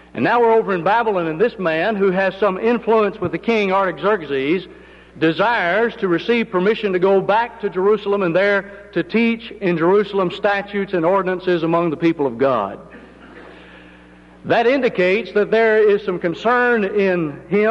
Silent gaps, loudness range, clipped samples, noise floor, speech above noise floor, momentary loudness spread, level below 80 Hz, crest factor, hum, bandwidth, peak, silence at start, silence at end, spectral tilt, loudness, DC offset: none; 3 LU; under 0.1%; -44 dBFS; 27 dB; 6 LU; -54 dBFS; 12 dB; 60 Hz at -50 dBFS; 7.2 kHz; -6 dBFS; 0.15 s; 0 s; -7.5 dB/octave; -18 LUFS; under 0.1%